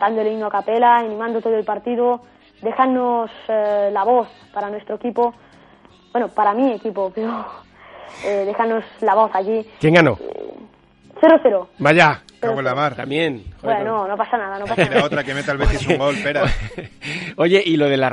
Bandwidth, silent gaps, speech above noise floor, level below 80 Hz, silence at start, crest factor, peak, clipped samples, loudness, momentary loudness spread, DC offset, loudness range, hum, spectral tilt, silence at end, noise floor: 11.5 kHz; none; 31 dB; -36 dBFS; 0 s; 18 dB; 0 dBFS; under 0.1%; -18 LUFS; 13 LU; under 0.1%; 6 LU; none; -6 dB/octave; 0 s; -49 dBFS